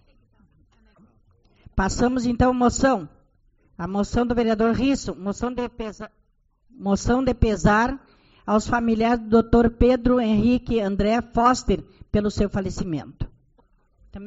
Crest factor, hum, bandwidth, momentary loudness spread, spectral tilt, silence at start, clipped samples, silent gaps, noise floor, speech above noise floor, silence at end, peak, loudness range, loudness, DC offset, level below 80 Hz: 18 dB; none; 8 kHz; 13 LU; -6 dB/octave; 1.75 s; under 0.1%; none; -63 dBFS; 42 dB; 0 s; -4 dBFS; 5 LU; -22 LUFS; under 0.1%; -34 dBFS